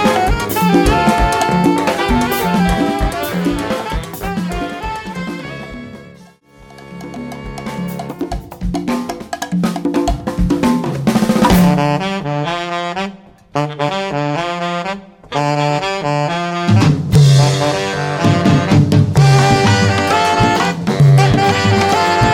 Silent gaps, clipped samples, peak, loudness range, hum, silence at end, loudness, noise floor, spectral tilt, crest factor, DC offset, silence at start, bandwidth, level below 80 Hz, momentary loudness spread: none; under 0.1%; 0 dBFS; 14 LU; none; 0 s; -15 LUFS; -42 dBFS; -6 dB/octave; 14 dB; under 0.1%; 0 s; 17.5 kHz; -30 dBFS; 14 LU